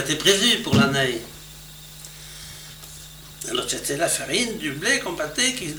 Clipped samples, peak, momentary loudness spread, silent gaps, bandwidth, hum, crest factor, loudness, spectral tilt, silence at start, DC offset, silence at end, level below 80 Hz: under 0.1%; -4 dBFS; 21 LU; none; over 20 kHz; none; 20 dB; -21 LUFS; -2.5 dB/octave; 0 s; under 0.1%; 0 s; -50 dBFS